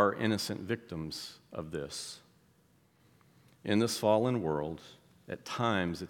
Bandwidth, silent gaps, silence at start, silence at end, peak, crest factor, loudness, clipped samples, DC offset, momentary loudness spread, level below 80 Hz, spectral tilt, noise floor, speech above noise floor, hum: 18 kHz; none; 0 s; 0 s; -12 dBFS; 22 dB; -33 LUFS; under 0.1%; under 0.1%; 16 LU; -66 dBFS; -5 dB/octave; -67 dBFS; 34 dB; none